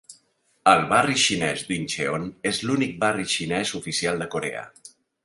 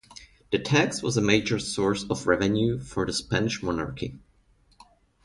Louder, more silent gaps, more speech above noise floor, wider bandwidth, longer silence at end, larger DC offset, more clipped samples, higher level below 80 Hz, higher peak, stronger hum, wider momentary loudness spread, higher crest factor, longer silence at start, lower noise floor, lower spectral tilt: first, -23 LUFS vs -26 LUFS; neither; first, 41 dB vs 37 dB; about the same, 11.5 kHz vs 11.5 kHz; second, 0.35 s vs 1.05 s; neither; neither; second, -58 dBFS vs -50 dBFS; first, -2 dBFS vs -6 dBFS; neither; about the same, 10 LU vs 8 LU; about the same, 22 dB vs 22 dB; about the same, 0.1 s vs 0.1 s; about the same, -64 dBFS vs -62 dBFS; second, -3 dB/octave vs -5 dB/octave